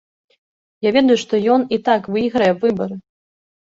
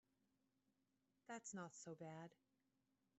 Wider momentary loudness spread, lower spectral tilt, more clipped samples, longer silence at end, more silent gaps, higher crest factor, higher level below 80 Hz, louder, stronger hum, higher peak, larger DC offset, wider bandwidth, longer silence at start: first, 9 LU vs 6 LU; about the same, -5.5 dB/octave vs -5.5 dB/octave; neither; second, 0.6 s vs 0.85 s; neither; about the same, 16 dB vs 18 dB; first, -58 dBFS vs under -90 dBFS; first, -17 LUFS vs -56 LUFS; neither; first, -2 dBFS vs -42 dBFS; neither; about the same, 7.8 kHz vs 8 kHz; second, 0.8 s vs 1.3 s